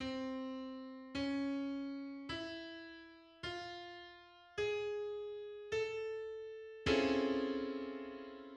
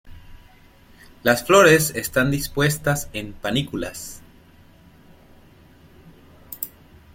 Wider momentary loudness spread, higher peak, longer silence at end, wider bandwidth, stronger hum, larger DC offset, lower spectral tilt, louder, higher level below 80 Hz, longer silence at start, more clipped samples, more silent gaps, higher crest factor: second, 15 LU vs 19 LU; second, -20 dBFS vs -2 dBFS; second, 0 s vs 0.45 s; second, 9.4 kHz vs 16.5 kHz; neither; neither; about the same, -5 dB/octave vs -4 dB/octave; second, -41 LUFS vs -20 LUFS; second, -64 dBFS vs -46 dBFS; about the same, 0 s vs 0.05 s; neither; neither; about the same, 22 dB vs 22 dB